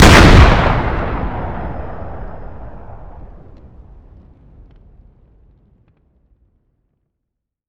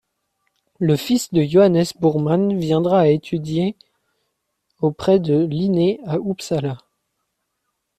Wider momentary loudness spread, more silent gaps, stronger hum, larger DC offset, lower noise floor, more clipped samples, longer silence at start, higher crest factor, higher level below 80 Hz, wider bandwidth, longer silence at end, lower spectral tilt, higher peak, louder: first, 29 LU vs 9 LU; neither; neither; neither; about the same, -78 dBFS vs -75 dBFS; first, 0.7% vs under 0.1%; second, 0 s vs 0.8 s; about the same, 16 dB vs 16 dB; first, -20 dBFS vs -56 dBFS; first, 19 kHz vs 14.5 kHz; first, 4.5 s vs 1.2 s; second, -5.5 dB/octave vs -7 dB/octave; first, 0 dBFS vs -4 dBFS; first, -12 LUFS vs -19 LUFS